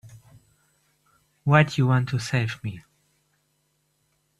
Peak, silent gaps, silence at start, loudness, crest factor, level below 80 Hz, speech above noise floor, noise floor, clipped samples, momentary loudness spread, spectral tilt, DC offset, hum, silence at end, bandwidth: -2 dBFS; none; 0.05 s; -23 LUFS; 24 dB; -60 dBFS; 49 dB; -71 dBFS; under 0.1%; 16 LU; -6.5 dB/octave; under 0.1%; none; 1.6 s; 12 kHz